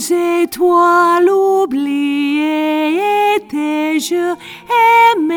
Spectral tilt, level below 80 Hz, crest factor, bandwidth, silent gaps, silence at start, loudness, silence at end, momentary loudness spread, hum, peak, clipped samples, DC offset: -3 dB/octave; -62 dBFS; 12 dB; over 20 kHz; none; 0 s; -13 LUFS; 0 s; 7 LU; none; 0 dBFS; under 0.1%; under 0.1%